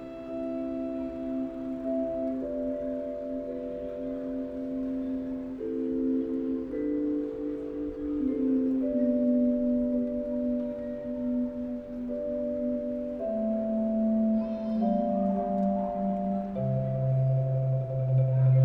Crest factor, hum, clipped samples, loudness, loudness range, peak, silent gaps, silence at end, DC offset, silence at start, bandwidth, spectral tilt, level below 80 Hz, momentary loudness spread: 14 dB; none; under 0.1%; -30 LUFS; 5 LU; -14 dBFS; none; 0 s; under 0.1%; 0 s; 4.1 kHz; -12 dB/octave; -54 dBFS; 9 LU